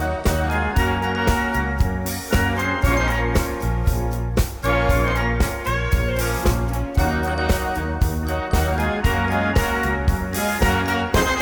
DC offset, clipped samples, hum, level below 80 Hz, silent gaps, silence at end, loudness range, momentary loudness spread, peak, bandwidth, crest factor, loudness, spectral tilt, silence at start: under 0.1%; under 0.1%; none; -24 dBFS; none; 0 s; 1 LU; 4 LU; -6 dBFS; over 20 kHz; 14 dB; -21 LUFS; -5.5 dB/octave; 0 s